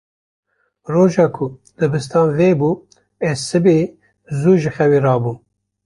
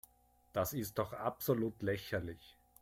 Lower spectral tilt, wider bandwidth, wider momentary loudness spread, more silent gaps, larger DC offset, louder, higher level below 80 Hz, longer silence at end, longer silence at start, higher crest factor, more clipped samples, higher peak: first, -7 dB/octave vs -5.5 dB/octave; second, 11.5 kHz vs 16.5 kHz; first, 12 LU vs 7 LU; neither; neither; first, -17 LUFS vs -39 LUFS; first, -52 dBFS vs -64 dBFS; first, 0.5 s vs 0.3 s; first, 0.9 s vs 0.55 s; about the same, 14 dB vs 18 dB; neither; first, -2 dBFS vs -20 dBFS